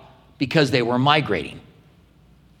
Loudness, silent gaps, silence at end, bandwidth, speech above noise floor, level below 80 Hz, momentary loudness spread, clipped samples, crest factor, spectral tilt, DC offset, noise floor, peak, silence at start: -20 LUFS; none; 1 s; 14.5 kHz; 33 dB; -56 dBFS; 10 LU; under 0.1%; 22 dB; -6 dB/octave; under 0.1%; -53 dBFS; 0 dBFS; 0.4 s